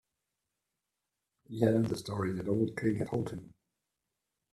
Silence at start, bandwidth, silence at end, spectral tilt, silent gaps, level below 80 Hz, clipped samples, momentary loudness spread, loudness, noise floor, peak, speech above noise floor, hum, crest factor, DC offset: 1.5 s; 13.5 kHz; 1.05 s; -7.5 dB/octave; none; -66 dBFS; under 0.1%; 12 LU; -33 LUFS; -87 dBFS; -12 dBFS; 55 dB; none; 22 dB; under 0.1%